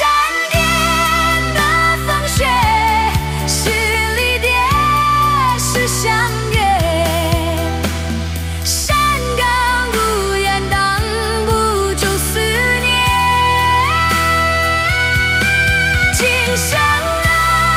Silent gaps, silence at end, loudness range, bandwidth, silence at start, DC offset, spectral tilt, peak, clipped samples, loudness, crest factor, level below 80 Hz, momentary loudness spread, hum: none; 0 s; 3 LU; 16 kHz; 0 s; under 0.1%; -3.5 dB/octave; 0 dBFS; under 0.1%; -14 LUFS; 14 dB; -26 dBFS; 4 LU; none